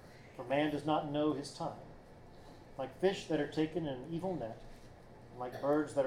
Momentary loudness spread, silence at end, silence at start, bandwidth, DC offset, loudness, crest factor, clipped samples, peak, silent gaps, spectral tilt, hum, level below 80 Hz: 23 LU; 0 s; 0 s; 13.5 kHz; under 0.1%; -37 LUFS; 18 dB; under 0.1%; -18 dBFS; none; -6 dB/octave; none; -62 dBFS